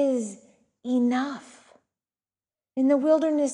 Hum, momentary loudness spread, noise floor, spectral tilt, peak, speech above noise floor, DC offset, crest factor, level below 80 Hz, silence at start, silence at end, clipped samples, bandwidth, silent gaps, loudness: none; 16 LU; under -90 dBFS; -4.5 dB/octave; -10 dBFS; over 67 dB; under 0.1%; 16 dB; -78 dBFS; 0 s; 0 s; under 0.1%; 11 kHz; none; -24 LUFS